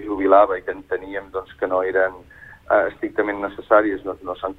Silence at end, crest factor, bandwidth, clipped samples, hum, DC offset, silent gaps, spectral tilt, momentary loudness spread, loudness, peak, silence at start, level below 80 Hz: 0.05 s; 18 dB; 4.1 kHz; under 0.1%; none; under 0.1%; none; -7.5 dB/octave; 13 LU; -21 LUFS; -2 dBFS; 0 s; -52 dBFS